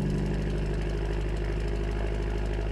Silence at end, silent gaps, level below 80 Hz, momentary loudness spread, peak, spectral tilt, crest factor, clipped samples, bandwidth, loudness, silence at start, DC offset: 0 s; none; -30 dBFS; 2 LU; -18 dBFS; -7.5 dB/octave; 10 dB; under 0.1%; 11 kHz; -31 LUFS; 0 s; under 0.1%